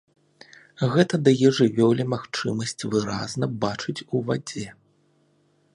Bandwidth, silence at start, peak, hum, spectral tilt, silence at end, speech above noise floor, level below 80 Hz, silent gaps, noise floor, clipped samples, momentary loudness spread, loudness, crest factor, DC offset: 11.5 kHz; 0.8 s; -4 dBFS; none; -6 dB/octave; 1.05 s; 41 dB; -60 dBFS; none; -64 dBFS; under 0.1%; 10 LU; -23 LUFS; 20 dB; under 0.1%